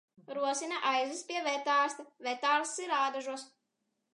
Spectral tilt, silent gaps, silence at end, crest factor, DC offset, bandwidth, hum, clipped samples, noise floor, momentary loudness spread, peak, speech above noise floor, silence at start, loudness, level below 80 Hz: 0 dB/octave; none; 0.7 s; 18 dB; under 0.1%; 11 kHz; none; under 0.1%; -83 dBFS; 10 LU; -16 dBFS; 50 dB; 0.3 s; -32 LUFS; under -90 dBFS